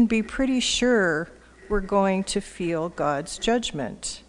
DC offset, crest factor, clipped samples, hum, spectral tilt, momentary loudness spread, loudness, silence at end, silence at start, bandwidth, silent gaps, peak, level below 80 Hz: under 0.1%; 16 dB; under 0.1%; none; -4 dB/octave; 9 LU; -24 LUFS; 0.1 s; 0 s; 10.5 kHz; none; -8 dBFS; -42 dBFS